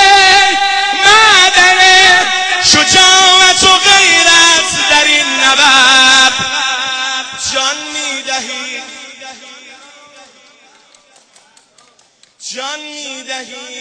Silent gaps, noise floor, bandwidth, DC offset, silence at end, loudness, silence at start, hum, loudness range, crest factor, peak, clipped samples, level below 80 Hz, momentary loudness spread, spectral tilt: none; -49 dBFS; 11 kHz; under 0.1%; 0 s; -6 LUFS; 0 s; none; 21 LU; 10 dB; 0 dBFS; 0.5%; -44 dBFS; 19 LU; 0.5 dB/octave